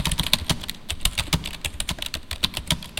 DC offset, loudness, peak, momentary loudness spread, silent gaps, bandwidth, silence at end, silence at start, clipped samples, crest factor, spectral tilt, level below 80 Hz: under 0.1%; -25 LUFS; 0 dBFS; 8 LU; none; 17 kHz; 0 s; 0 s; under 0.1%; 26 dB; -2.5 dB/octave; -34 dBFS